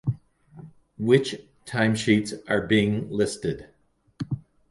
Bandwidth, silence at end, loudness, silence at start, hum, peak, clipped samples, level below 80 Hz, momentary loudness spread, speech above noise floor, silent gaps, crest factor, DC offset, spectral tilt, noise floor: 11.5 kHz; 0.3 s; -25 LUFS; 0.05 s; none; -6 dBFS; under 0.1%; -54 dBFS; 15 LU; 25 dB; none; 20 dB; under 0.1%; -6 dB/octave; -48 dBFS